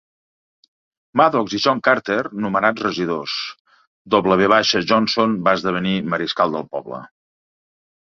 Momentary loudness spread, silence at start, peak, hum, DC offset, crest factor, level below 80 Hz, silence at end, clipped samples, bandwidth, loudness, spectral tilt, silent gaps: 11 LU; 1.15 s; 0 dBFS; none; under 0.1%; 20 dB; -58 dBFS; 1.05 s; under 0.1%; 7.4 kHz; -18 LUFS; -5 dB/octave; 3.60-3.65 s, 3.87-4.05 s